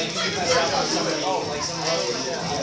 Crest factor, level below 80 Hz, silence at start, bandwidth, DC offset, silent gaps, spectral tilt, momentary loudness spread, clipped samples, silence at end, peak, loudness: 16 dB; -52 dBFS; 0 s; 8 kHz; under 0.1%; none; -2.5 dB/octave; 5 LU; under 0.1%; 0 s; -8 dBFS; -23 LUFS